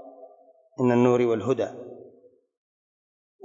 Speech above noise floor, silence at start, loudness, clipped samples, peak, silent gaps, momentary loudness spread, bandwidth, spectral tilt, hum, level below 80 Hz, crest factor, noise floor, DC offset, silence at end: 34 dB; 0.05 s; -23 LUFS; under 0.1%; -8 dBFS; none; 23 LU; 7.6 kHz; -7.5 dB/octave; none; -74 dBFS; 20 dB; -56 dBFS; under 0.1%; 1.5 s